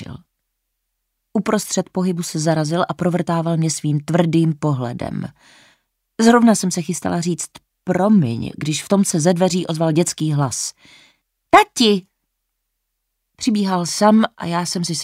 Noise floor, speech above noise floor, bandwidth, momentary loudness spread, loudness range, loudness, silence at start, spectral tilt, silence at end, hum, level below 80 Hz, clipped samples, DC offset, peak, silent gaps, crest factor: -75 dBFS; 57 dB; 16 kHz; 11 LU; 3 LU; -18 LUFS; 0 s; -5 dB/octave; 0 s; none; -56 dBFS; under 0.1%; under 0.1%; 0 dBFS; none; 18 dB